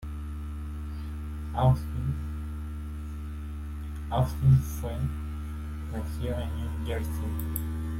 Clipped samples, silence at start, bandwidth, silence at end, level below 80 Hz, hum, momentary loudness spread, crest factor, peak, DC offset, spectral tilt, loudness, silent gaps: under 0.1%; 0 s; 16.5 kHz; 0 s; -36 dBFS; none; 13 LU; 18 dB; -10 dBFS; under 0.1%; -7.5 dB/octave; -31 LUFS; none